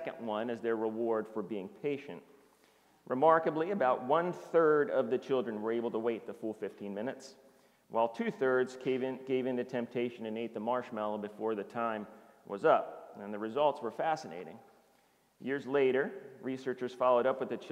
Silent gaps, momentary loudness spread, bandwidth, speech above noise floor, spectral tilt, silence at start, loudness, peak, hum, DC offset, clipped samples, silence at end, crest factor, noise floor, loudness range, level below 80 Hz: none; 13 LU; 12 kHz; 36 dB; -6.5 dB/octave; 0 s; -33 LUFS; -12 dBFS; none; under 0.1%; under 0.1%; 0 s; 22 dB; -69 dBFS; 6 LU; -84 dBFS